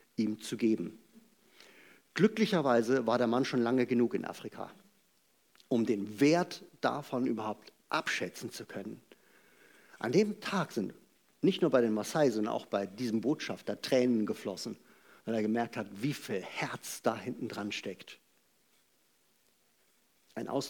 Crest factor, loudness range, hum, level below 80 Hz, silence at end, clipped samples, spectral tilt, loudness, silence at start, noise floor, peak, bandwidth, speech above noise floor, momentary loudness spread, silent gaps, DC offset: 22 dB; 8 LU; none; -86 dBFS; 0 s; under 0.1%; -5.5 dB/octave; -33 LUFS; 0.2 s; -72 dBFS; -12 dBFS; 19 kHz; 40 dB; 15 LU; none; under 0.1%